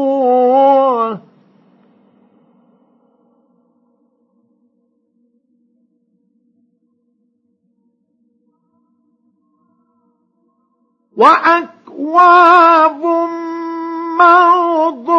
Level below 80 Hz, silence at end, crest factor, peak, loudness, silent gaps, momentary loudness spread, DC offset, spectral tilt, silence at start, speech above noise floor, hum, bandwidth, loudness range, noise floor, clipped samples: -78 dBFS; 0 s; 16 dB; 0 dBFS; -11 LUFS; none; 16 LU; under 0.1%; -5 dB/octave; 0 s; 53 dB; none; 8 kHz; 9 LU; -63 dBFS; under 0.1%